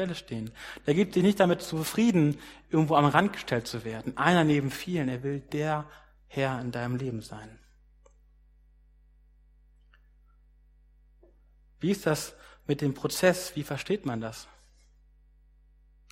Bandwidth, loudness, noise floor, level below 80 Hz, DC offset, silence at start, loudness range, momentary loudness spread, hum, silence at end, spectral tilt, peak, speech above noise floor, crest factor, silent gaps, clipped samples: 16 kHz; -28 LUFS; -60 dBFS; -58 dBFS; under 0.1%; 0 s; 11 LU; 16 LU; none; 1.7 s; -6 dB/octave; -4 dBFS; 32 dB; 26 dB; none; under 0.1%